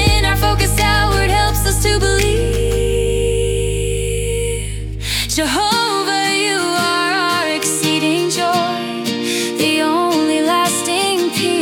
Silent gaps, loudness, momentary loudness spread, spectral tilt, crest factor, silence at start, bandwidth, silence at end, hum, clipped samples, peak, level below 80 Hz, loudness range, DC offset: none; -16 LUFS; 5 LU; -3.5 dB/octave; 14 dB; 0 s; 18 kHz; 0 s; none; under 0.1%; -2 dBFS; -24 dBFS; 2 LU; under 0.1%